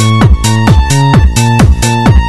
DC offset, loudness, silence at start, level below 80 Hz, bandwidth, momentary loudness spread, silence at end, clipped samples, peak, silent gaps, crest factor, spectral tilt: under 0.1%; -7 LUFS; 0 s; -12 dBFS; 12.5 kHz; 1 LU; 0 s; 0.1%; 0 dBFS; none; 6 dB; -5.5 dB/octave